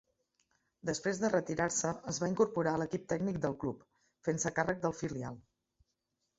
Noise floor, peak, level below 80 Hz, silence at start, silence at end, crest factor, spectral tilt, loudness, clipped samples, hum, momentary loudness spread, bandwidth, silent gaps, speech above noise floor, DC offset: -84 dBFS; -16 dBFS; -64 dBFS; 0.85 s; 1 s; 20 dB; -5.5 dB/octave; -35 LUFS; under 0.1%; none; 10 LU; 8 kHz; none; 50 dB; under 0.1%